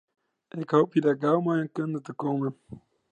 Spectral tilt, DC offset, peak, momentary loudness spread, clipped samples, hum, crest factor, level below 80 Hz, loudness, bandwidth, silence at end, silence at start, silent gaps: -8.5 dB/octave; under 0.1%; -8 dBFS; 13 LU; under 0.1%; none; 20 dB; -70 dBFS; -26 LUFS; 8.6 kHz; 0.35 s; 0.55 s; none